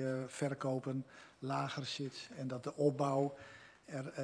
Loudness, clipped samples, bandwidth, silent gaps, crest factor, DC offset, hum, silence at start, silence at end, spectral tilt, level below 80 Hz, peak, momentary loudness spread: -39 LUFS; under 0.1%; 11 kHz; none; 18 dB; under 0.1%; none; 0 s; 0 s; -6 dB/octave; -80 dBFS; -20 dBFS; 14 LU